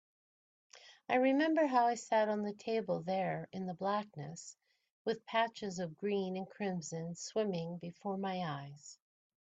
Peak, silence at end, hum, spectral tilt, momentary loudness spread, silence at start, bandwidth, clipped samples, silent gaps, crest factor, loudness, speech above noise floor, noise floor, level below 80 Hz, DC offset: -18 dBFS; 0.55 s; none; -5.5 dB/octave; 16 LU; 0.75 s; 9 kHz; under 0.1%; 4.91-5.05 s; 18 dB; -36 LUFS; over 54 dB; under -90 dBFS; -82 dBFS; under 0.1%